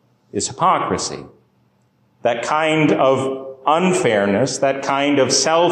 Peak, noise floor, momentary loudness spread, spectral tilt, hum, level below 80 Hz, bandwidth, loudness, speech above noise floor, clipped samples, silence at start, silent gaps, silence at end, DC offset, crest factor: -4 dBFS; -60 dBFS; 9 LU; -4 dB/octave; none; -54 dBFS; 12 kHz; -17 LUFS; 43 dB; under 0.1%; 0.35 s; none; 0 s; under 0.1%; 14 dB